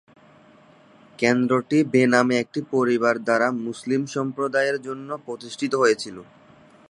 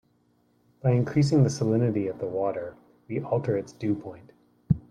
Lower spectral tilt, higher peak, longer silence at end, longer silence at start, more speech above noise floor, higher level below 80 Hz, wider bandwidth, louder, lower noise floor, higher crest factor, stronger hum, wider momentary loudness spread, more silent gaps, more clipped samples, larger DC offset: second, -5.5 dB/octave vs -8 dB/octave; first, -2 dBFS vs -8 dBFS; first, 0.65 s vs 0.1 s; first, 1.2 s vs 0.85 s; second, 30 dB vs 41 dB; second, -70 dBFS vs -56 dBFS; about the same, 11 kHz vs 10 kHz; first, -22 LUFS vs -27 LUFS; second, -52 dBFS vs -66 dBFS; about the same, 22 dB vs 20 dB; neither; about the same, 14 LU vs 12 LU; neither; neither; neither